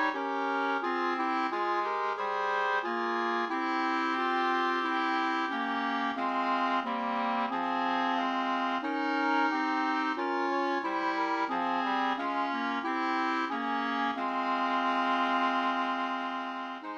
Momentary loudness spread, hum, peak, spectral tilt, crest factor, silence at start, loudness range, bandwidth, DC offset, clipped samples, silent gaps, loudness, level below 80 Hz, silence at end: 3 LU; none; -18 dBFS; -3.5 dB/octave; 12 dB; 0 s; 1 LU; 8.4 kHz; under 0.1%; under 0.1%; none; -30 LUFS; -80 dBFS; 0 s